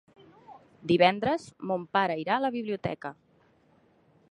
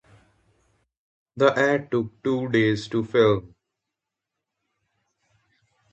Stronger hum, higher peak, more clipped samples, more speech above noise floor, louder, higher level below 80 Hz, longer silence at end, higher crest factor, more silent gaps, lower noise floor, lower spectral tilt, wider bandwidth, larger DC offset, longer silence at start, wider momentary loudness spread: neither; about the same, -6 dBFS vs -4 dBFS; neither; second, 36 dB vs 63 dB; second, -28 LUFS vs -22 LUFS; second, -66 dBFS vs -60 dBFS; second, 1.15 s vs 2.45 s; about the same, 24 dB vs 22 dB; neither; second, -64 dBFS vs -85 dBFS; about the same, -6.5 dB/octave vs -6.5 dB/octave; first, 10.5 kHz vs 8.4 kHz; neither; second, 0.5 s vs 1.35 s; first, 15 LU vs 7 LU